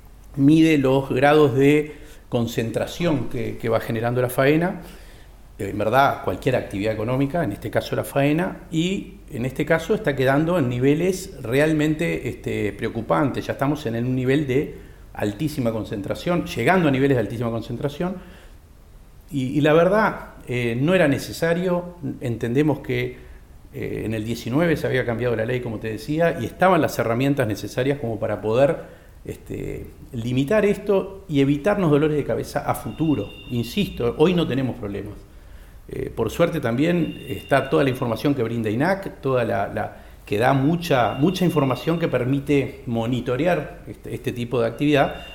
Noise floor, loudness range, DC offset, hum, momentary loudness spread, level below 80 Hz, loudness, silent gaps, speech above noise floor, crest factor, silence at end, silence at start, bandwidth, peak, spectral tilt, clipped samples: -46 dBFS; 3 LU; under 0.1%; none; 12 LU; -44 dBFS; -22 LUFS; none; 24 dB; 18 dB; 0 s; 0 s; 17.5 kHz; -4 dBFS; -7 dB/octave; under 0.1%